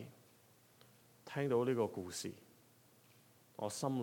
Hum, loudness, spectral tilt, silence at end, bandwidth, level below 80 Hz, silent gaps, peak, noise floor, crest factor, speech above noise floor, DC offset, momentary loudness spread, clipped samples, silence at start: none; -39 LUFS; -5.5 dB/octave; 0 s; 19 kHz; -82 dBFS; none; -24 dBFS; -67 dBFS; 18 dB; 29 dB; under 0.1%; 23 LU; under 0.1%; 0 s